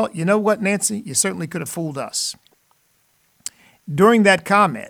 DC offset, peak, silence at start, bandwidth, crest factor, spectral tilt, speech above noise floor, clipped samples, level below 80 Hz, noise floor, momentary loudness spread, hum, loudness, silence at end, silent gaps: under 0.1%; -2 dBFS; 0 s; 18.5 kHz; 18 dB; -4 dB/octave; 44 dB; under 0.1%; -64 dBFS; -62 dBFS; 20 LU; none; -18 LUFS; 0 s; none